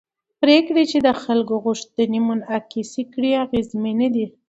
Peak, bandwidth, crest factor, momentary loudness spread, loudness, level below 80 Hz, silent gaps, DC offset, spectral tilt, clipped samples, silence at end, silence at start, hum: -2 dBFS; 8 kHz; 18 dB; 10 LU; -20 LUFS; -56 dBFS; none; under 0.1%; -5 dB/octave; under 0.1%; 0.2 s; 0.4 s; none